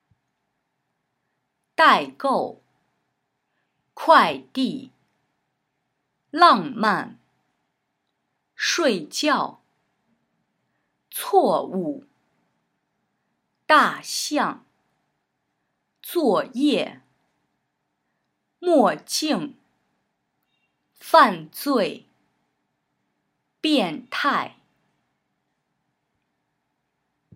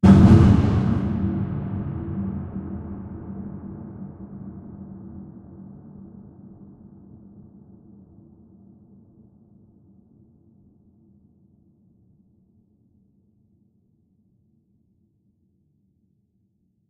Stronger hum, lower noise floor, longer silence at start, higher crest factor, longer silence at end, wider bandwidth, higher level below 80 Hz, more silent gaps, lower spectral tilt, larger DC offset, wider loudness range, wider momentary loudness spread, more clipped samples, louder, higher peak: neither; first, -76 dBFS vs -68 dBFS; first, 1.8 s vs 0.05 s; about the same, 24 dB vs 24 dB; second, 2.9 s vs 11.15 s; first, 16 kHz vs 8.2 kHz; second, -84 dBFS vs -38 dBFS; neither; second, -3.5 dB/octave vs -9.5 dB/octave; neither; second, 6 LU vs 27 LU; second, 16 LU vs 31 LU; neither; about the same, -21 LUFS vs -21 LUFS; about the same, 0 dBFS vs -2 dBFS